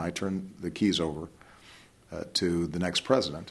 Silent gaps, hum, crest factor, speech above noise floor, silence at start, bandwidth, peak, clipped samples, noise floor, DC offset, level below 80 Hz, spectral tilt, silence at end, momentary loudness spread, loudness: none; none; 22 dB; 25 dB; 0 s; 12.5 kHz; -8 dBFS; under 0.1%; -55 dBFS; under 0.1%; -56 dBFS; -5 dB/octave; 0 s; 15 LU; -29 LUFS